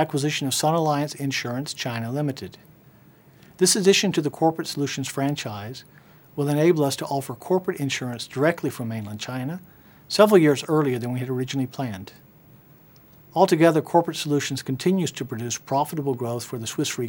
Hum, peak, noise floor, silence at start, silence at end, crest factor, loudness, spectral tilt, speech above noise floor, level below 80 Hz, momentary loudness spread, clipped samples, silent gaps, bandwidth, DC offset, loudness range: none; -2 dBFS; -52 dBFS; 0 s; 0 s; 22 dB; -23 LUFS; -4.5 dB/octave; 29 dB; -66 dBFS; 13 LU; under 0.1%; none; 19.5 kHz; under 0.1%; 3 LU